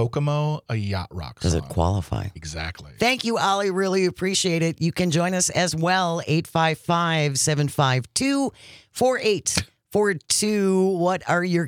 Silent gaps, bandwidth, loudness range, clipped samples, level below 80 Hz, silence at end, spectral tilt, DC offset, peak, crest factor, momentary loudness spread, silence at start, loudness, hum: none; 17 kHz; 3 LU; under 0.1%; -48 dBFS; 0 s; -4.5 dB/octave; under 0.1%; -6 dBFS; 18 dB; 8 LU; 0 s; -22 LUFS; none